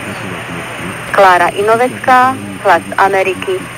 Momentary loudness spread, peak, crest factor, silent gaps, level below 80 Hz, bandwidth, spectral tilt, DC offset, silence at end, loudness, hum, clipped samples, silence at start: 14 LU; 0 dBFS; 12 dB; none; -48 dBFS; 16.5 kHz; -4 dB/octave; under 0.1%; 0 s; -12 LUFS; none; under 0.1%; 0 s